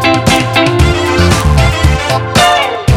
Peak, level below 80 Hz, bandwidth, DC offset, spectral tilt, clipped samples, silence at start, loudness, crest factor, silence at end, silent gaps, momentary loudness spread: 0 dBFS; -18 dBFS; 16.5 kHz; under 0.1%; -5 dB/octave; under 0.1%; 0 s; -9 LUFS; 10 dB; 0 s; none; 3 LU